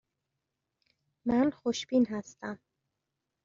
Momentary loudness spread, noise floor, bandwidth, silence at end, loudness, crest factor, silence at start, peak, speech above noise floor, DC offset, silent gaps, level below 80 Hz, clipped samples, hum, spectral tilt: 14 LU; -85 dBFS; 7.6 kHz; 0.9 s; -30 LUFS; 18 dB; 1.25 s; -16 dBFS; 56 dB; under 0.1%; none; -66 dBFS; under 0.1%; none; -4.5 dB/octave